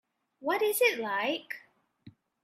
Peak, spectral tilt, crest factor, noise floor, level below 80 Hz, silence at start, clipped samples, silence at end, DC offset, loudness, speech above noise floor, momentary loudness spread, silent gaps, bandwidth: -12 dBFS; -2 dB/octave; 22 dB; -57 dBFS; -84 dBFS; 0.4 s; under 0.1%; 0.35 s; under 0.1%; -29 LUFS; 28 dB; 16 LU; none; 16 kHz